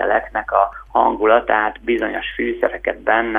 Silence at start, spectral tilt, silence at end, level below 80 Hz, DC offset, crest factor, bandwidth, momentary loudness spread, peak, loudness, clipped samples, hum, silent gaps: 0 s; -6.5 dB/octave; 0 s; -44 dBFS; under 0.1%; 18 dB; 3.8 kHz; 7 LU; 0 dBFS; -18 LUFS; under 0.1%; none; none